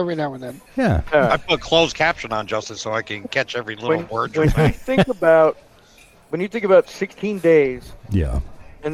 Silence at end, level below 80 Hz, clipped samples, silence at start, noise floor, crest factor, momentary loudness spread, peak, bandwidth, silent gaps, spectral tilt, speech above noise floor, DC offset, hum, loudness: 0 s; -34 dBFS; under 0.1%; 0 s; -50 dBFS; 16 dB; 12 LU; -2 dBFS; 14.5 kHz; none; -5.5 dB/octave; 31 dB; under 0.1%; none; -19 LUFS